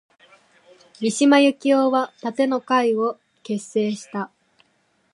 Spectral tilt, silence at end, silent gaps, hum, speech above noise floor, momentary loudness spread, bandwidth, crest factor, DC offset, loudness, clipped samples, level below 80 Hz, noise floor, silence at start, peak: -4.5 dB/octave; 0.9 s; none; none; 46 dB; 14 LU; 11.5 kHz; 20 dB; under 0.1%; -21 LUFS; under 0.1%; -78 dBFS; -65 dBFS; 1 s; -2 dBFS